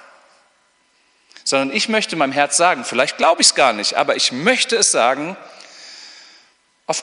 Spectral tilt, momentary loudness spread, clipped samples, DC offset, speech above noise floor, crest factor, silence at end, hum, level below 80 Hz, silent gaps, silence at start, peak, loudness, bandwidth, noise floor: -1 dB/octave; 24 LU; under 0.1%; under 0.1%; 43 dB; 20 dB; 0 s; none; -70 dBFS; none; 1.45 s; 0 dBFS; -16 LUFS; 11 kHz; -60 dBFS